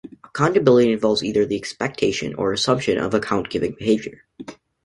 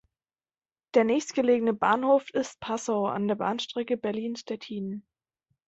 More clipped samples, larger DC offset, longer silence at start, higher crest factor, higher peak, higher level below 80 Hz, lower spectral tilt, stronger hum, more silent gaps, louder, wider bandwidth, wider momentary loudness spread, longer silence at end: neither; neither; second, 0.05 s vs 0.95 s; about the same, 18 dB vs 20 dB; first, -2 dBFS vs -8 dBFS; first, -52 dBFS vs -70 dBFS; about the same, -5 dB/octave vs -5 dB/octave; neither; neither; first, -20 LUFS vs -27 LUFS; first, 11.5 kHz vs 8.2 kHz; first, 20 LU vs 11 LU; second, 0.3 s vs 0.7 s